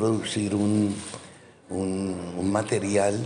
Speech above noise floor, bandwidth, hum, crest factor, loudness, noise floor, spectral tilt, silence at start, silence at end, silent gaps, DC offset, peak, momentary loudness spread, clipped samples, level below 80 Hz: 23 dB; 11 kHz; none; 16 dB; -26 LUFS; -48 dBFS; -5.5 dB/octave; 0 s; 0 s; none; under 0.1%; -10 dBFS; 11 LU; under 0.1%; -62 dBFS